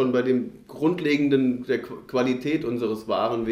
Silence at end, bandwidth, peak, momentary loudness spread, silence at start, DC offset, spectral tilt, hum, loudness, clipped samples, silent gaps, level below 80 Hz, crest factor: 0 s; 15 kHz; -8 dBFS; 7 LU; 0 s; under 0.1%; -7 dB/octave; none; -24 LUFS; under 0.1%; none; -60 dBFS; 14 dB